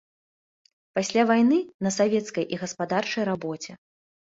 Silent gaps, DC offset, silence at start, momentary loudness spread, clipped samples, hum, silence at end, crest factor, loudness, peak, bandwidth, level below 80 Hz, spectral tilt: 1.74-1.79 s; under 0.1%; 0.95 s; 12 LU; under 0.1%; none; 0.55 s; 18 dB; -25 LUFS; -8 dBFS; 8 kHz; -70 dBFS; -5 dB/octave